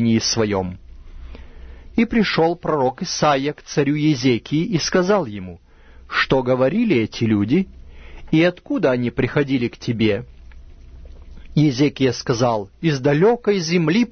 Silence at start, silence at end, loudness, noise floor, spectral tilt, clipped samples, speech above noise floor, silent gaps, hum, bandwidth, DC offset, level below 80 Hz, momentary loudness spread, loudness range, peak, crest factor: 0 s; 0.05 s; -19 LUFS; -40 dBFS; -5.5 dB/octave; under 0.1%; 22 dB; none; none; 6.6 kHz; under 0.1%; -42 dBFS; 7 LU; 2 LU; -4 dBFS; 16 dB